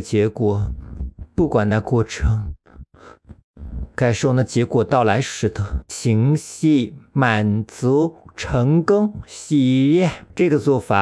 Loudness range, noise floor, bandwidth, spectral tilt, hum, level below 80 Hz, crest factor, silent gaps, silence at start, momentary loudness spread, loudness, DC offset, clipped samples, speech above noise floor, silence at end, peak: 4 LU; -44 dBFS; 12 kHz; -6.5 dB/octave; none; -36 dBFS; 16 dB; 3.44-3.54 s; 0 s; 11 LU; -19 LUFS; under 0.1%; under 0.1%; 26 dB; 0 s; -2 dBFS